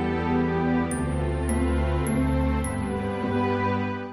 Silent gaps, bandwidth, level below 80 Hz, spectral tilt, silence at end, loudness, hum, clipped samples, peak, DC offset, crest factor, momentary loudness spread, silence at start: none; 13 kHz; -32 dBFS; -7 dB/octave; 0 s; -25 LUFS; none; under 0.1%; -12 dBFS; under 0.1%; 12 dB; 4 LU; 0 s